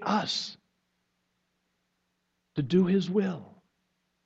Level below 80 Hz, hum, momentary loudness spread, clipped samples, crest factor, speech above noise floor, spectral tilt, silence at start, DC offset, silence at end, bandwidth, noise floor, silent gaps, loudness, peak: -68 dBFS; none; 14 LU; under 0.1%; 20 dB; 51 dB; -6 dB/octave; 0 s; under 0.1%; 0.75 s; 8 kHz; -78 dBFS; none; -28 LUFS; -12 dBFS